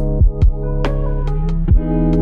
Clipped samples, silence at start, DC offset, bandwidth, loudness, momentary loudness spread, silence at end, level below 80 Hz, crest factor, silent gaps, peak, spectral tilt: under 0.1%; 0 s; under 0.1%; 5.2 kHz; -18 LUFS; 6 LU; 0 s; -16 dBFS; 10 dB; none; -4 dBFS; -10 dB/octave